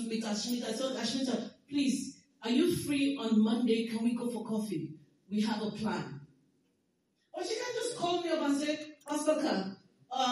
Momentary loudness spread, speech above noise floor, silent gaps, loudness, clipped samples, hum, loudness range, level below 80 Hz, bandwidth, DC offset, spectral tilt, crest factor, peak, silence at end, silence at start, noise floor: 11 LU; 44 dB; none; -33 LUFS; under 0.1%; none; 6 LU; -78 dBFS; 15 kHz; under 0.1%; -4.5 dB/octave; 18 dB; -16 dBFS; 0 s; 0 s; -76 dBFS